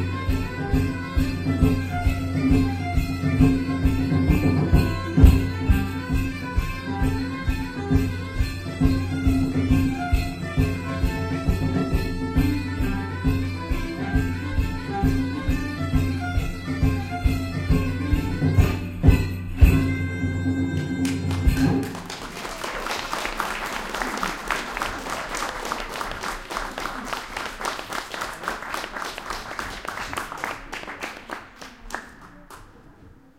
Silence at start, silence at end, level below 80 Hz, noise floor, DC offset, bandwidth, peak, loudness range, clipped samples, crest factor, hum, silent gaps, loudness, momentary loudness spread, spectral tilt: 0 s; 0.3 s; -28 dBFS; -49 dBFS; 0.1%; 16 kHz; -2 dBFS; 9 LU; under 0.1%; 20 dB; none; none; -25 LUFS; 11 LU; -6.5 dB/octave